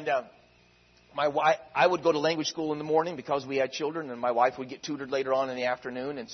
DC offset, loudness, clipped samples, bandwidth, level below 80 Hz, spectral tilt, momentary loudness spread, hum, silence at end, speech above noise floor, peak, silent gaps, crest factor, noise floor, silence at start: under 0.1%; -28 LUFS; under 0.1%; 6.4 kHz; -70 dBFS; -4 dB/octave; 10 LU; none; 0 s; 33 dB; -10 dBFS; none; 18 dB; -61 dBFS; 0 s